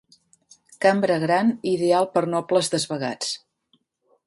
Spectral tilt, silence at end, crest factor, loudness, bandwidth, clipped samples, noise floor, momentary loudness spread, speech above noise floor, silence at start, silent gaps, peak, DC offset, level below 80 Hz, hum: -4.5 dB/octave; 0.9 s; 18 dB; -22 LUFS; 11.5 kHz; under 0.1%; -67 dBFS; 7 LU; 46 dB; 0.8 s; none; -6 dBFS; under 0.1%; -68 dBFS; none